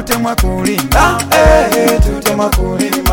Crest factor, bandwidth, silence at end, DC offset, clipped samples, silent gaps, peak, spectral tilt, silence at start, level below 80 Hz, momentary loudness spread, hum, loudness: 12 dB; 17.5 kHz; 0 s; under 0.1%; 0.2%; none; 0 dBFS; -4.5 dB/octave; 0 s; -18 dBFS; 6 LU; none; -12 LUFS